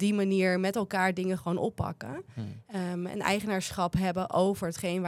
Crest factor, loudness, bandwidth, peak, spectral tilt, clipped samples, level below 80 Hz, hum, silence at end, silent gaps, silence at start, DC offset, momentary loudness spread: 18 dB; -30 LUFS; 14.5 kHz; -10 dBFS; -5.5 dB/octave; under 0.1%; -56 dBFS; none; 0 s; none; 0 s; under 0.1%; 12 LU